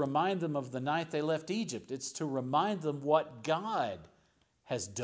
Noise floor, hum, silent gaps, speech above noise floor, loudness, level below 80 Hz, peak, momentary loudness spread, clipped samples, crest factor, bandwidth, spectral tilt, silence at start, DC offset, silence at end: -71 dBFS; none; none; 38 dB; -34 LUFS; -72 dBFS; -14 dBFS; 8 LU; under 0.1%; 20 dB; 8 kHz; -5 dB/octave; 0 s; under 0.1%; 0 s